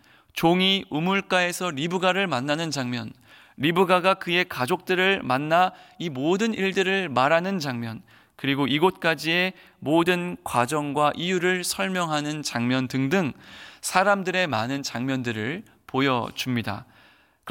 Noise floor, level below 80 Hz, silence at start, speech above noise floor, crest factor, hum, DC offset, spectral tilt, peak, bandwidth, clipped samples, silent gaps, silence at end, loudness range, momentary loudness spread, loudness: -57 dBFS; -64 dBFS; 0.35 s; 33 dB; 20 dB; none; under 0.1%; -4.5 dB/octave; -6 dBFS; 17 kHz; under 0.1%; none; 0 s; 2 LU; 10 LU; -24 LUFS